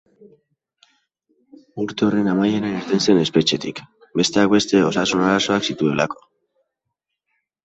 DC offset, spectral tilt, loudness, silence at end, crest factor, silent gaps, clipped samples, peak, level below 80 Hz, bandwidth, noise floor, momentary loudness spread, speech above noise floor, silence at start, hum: under 0.1%; -4.5 dB/octave; -19 LUFS; 1.5 s; 18 dB; none; under 0.1%; -2 dBFS; -58 dBFS; 8.2 kHz; -80 dBFS; 12 LU; 61 dB; 1.75 s; none